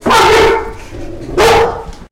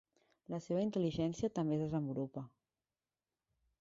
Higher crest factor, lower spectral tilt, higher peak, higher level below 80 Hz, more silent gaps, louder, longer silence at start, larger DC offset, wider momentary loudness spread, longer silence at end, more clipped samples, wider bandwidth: second, 10 dB vs 16 dB; second, -3.5 dB/octave vs -8 dB/octave; first, -2 dBFS vs -24 dBFS; first, -28 dBFS vs -68 dBFS; neither; first, -10 LUFS vs -38 LUFS; second, 0 s vs 0.5 s; neither; first, 20 LU vs 10 LU; second, 0.05 s vs 1.35 s; neither; first, 16.5 kHz vs 7.6 kHz